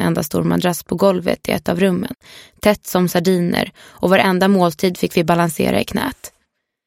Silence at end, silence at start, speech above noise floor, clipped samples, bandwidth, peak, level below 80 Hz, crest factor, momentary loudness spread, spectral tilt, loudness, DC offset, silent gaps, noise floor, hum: 0.6 s; 0 s; 52 dB; under 0.1%; 16.5 kHz; 0 dBFS; -46 dBFS; 18 dB; 9 LU; -5.5 dB/octave; -17 LUFS; under 0.1%; none; -69 dBFS; none